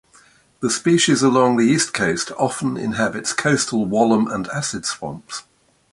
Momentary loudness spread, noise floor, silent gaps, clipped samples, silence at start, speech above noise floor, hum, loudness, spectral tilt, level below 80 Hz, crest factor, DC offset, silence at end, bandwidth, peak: 11 LU; -53 dBFS; none; under 0.1%; 0.6 s; 34 dB; none; -19 LUFS; -4 dB/octave; -56 dBFS; 18 dB; under 0.1%; 0.5 s; 11.5 kHz; -2 dBFS